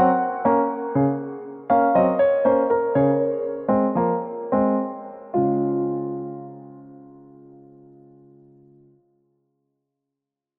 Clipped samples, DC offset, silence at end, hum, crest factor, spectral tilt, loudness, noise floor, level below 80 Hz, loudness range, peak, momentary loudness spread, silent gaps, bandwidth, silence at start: under 0.1%; under 0.1%; 3.45 s; none; 18 dB; -9 dB/octave; -21 LUFS; -85 dBFS; -58 dBFS; 11 LU; -6 dBFS; 16 LU; none; 3.8 kHz; 0 s